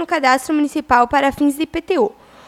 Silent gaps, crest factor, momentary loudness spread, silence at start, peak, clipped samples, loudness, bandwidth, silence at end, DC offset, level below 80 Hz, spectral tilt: none; 18 dB; 5 LU; 0 s; 0 dBFS; under 0.1%; -17 LUFS; 15 kHz; 0.4 s; under 0.1%; -46 dBFS; -4 dB/octave